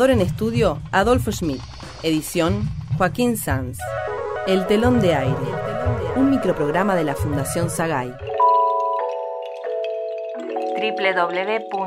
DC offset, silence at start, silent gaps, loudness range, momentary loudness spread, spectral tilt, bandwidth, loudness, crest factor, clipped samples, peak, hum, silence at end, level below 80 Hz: under 0.1%; 0 s; none; 3 LU; 10 LU; -6 dB/octave; 16 kHz; -21 LUFS; 16 dB; under 0.1%; -4 dBFS; none; 0 s; -40 dBFS